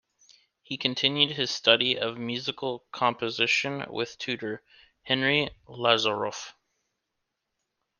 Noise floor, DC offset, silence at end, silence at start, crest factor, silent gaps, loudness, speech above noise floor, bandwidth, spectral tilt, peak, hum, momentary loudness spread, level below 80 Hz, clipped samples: -82 dBFS; under 0.1%; 1.5 s; 0.7 s; 26 dB; none; -26 LUFS; 54 dB; 10 kHz; -3.5 dB/octave; -4 dBFS; none; 12 LU; -68 dBFS; under 0.1%